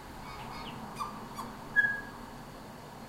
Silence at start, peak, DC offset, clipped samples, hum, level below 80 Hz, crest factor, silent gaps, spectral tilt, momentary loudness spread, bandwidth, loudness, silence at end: 0 s; -14 dBFS; under 0.1%; under 0.1%; none; -56 dBFS; 22 dB; none; -4 dB/octave; 19 LU; 16 kHz; -34 LUFS; 0 s